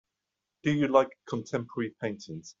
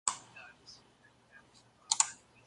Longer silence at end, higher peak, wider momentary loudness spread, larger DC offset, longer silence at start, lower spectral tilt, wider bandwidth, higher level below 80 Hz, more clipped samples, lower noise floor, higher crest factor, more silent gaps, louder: second, 0.1 s vs 0.3 s; about the same, -8 dBFS vs -8 dBFS; second, 13 LU vs 25 LU; neither; first, 0.65 s vs 0.05 s; first, -5.5 dB/octave vs 2 dB/octave; second, 7.6 kHz vs 11.5 kHz; first, -68 dBFS vs -78 dBFS; neither; first, -86 dBFS vs -65 dBFS; second, 22 dB vs 32 dB; neither; about the same, -30 LUFS vs -32 LUFS